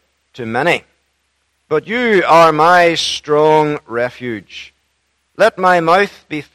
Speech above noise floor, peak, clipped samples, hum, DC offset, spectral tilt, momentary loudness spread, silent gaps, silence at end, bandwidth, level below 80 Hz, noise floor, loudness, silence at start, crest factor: 51 dB; 0 dBFS; 0.2%; none; under 0.1%; -4.5 dB/octave; 17 LU; none; 0.1 s; 15.5 kHz; -54 dBFS; -64 dBFS; -13 LUFS; 0.35 s; 14 dB